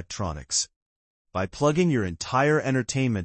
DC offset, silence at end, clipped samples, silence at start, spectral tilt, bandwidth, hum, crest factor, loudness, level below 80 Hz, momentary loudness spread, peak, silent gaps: under 0.1%; 0 s; under 0.1%; 0 s; -4.5 dB/octave; 8.8 kHz; none; 16 dB; -25 LUFS; -52 dBFS; 10 LU; -10 dBFS; 0.76-1.25 s